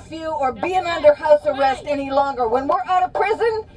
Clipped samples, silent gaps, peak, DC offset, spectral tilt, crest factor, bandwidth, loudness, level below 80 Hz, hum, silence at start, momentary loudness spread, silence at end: under 0.1%; none; -2 dBFS; under 0.1%; -5 dB/octave; 18 dB; 10.5 kHz; -19 LUFS; -48 dBFS; none; 0 s; 7 LU; 0.1 s